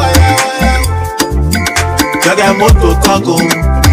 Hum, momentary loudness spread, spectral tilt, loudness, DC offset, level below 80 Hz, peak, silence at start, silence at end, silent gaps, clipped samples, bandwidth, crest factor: none; 5 LU; -4.5 dB/octave; -10 LUFS; under 0.1%; -16 dBFS; 0 dBFS; 0 s; 0 s; none; 1%; 16.5 kHz; 8 dB